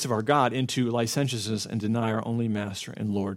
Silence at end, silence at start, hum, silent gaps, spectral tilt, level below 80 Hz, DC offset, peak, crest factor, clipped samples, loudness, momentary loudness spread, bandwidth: 0 s; 0 s; none; none; -5 dB/octave; -66 dBFS; under 0.1%; -6 dBFS; 20 dB; under 0.1%; -27 LUFS; 7 LU; 16.5 kHz